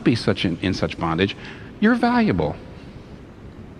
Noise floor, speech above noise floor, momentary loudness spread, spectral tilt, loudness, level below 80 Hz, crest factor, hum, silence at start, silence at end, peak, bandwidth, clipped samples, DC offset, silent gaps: -40 dBFS; 20 dB; 23 LU; -6.5 dB/octave; -21 LUFS; -44 dBFS; 18 dB; none; 0 s; 0 s; -4 dBFS; 11 kHz; under 0.1%; under 0.1%; none